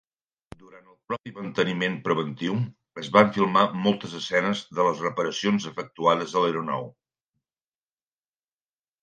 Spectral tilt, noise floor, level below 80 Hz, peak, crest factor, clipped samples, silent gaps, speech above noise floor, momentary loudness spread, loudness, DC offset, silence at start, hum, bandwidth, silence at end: -5.5 dB/octave; under -90 dBFS; -66 dBFS; 0 dBFS; 26 dB; under 0.1%; 1.20-1.24 s; over 65 dB; 13 LU; -25 LUFS; under 0.1%; 0.7 s; none; 9 kHz; 2.15 s